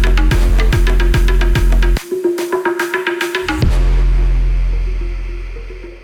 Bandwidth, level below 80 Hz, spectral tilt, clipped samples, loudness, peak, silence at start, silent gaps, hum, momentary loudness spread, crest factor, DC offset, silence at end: 14.5 kHz; -14 dBFS; -6 dB/octave; under 0.1%; -16 LUFS; -6 dBFS; 0 s; none; none; 11 LU; 8 dB; under 0.1%; 0 s